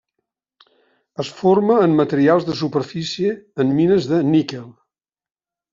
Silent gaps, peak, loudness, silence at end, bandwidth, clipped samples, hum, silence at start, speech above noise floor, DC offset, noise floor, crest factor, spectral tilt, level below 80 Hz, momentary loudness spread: none; -2 dBFS; -18 LUFS; 1 s; 7.6 kHz; under 0.1%; none; 1.2 s; 61 dB; under 0.1%; -79 dBFS; 16 dB; -6 dB/octave; -60 dBFS; 14 LU